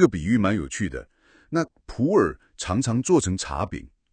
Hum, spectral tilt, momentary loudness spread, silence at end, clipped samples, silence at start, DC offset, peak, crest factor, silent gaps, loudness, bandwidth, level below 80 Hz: none; -5.5 dB/octave; 11 LU; 0.25 s; under 0.1%; 0 s; under 0.1%; -2 dBFS; 22 dB; none; -24 LUFS; 9.8 kHz; -44 dBFS